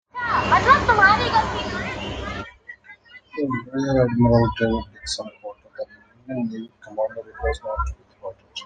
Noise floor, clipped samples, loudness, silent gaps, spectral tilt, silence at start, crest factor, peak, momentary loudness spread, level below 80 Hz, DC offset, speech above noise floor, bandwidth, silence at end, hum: -47 dBFS; under 0.1%; -21 LUFS; none; -5.5 dB/octave; 0.15 s; 20 dB; -2 dBFS; 22 LU; -38 dBFS; under 0.1%; 24 dB; 9.4 kHz; 0 s; none